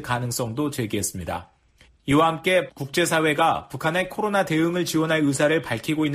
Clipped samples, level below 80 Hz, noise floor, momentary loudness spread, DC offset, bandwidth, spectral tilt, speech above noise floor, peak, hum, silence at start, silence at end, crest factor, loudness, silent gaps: under 0.1%; -54 dBFS; -57 dBFS; 7 LU; under 0.1%; 15.5 kHz; -4.5 dB/octave; 34 dB; -8 dBFS; none; 0 s; 0 s; 16 dB; -23 LUFS; none